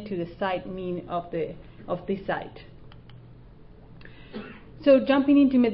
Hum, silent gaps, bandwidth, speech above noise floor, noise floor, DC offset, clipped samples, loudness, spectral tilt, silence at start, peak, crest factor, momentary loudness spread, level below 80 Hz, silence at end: none; none; 5.4 kHz; 24 dB; -48 dBFS; under 0.1%; under 0.1%; -25 LUFS; -10.5 dB/octave; 0 s; -8 dBFS; 18 dB; 22 LU; -52 dBFS; 0 s